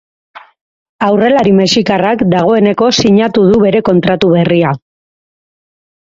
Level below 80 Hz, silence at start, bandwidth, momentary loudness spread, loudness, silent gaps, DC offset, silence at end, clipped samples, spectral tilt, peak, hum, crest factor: -44 dBFS; 0.35 s; 7.8 kHz; 4 LU; -10 LUFS; 0.61-0.99 s; under 0.1%; 1.25 s; under 0.1%; -6 dB/octave; 0 dBFS; none; 10 dB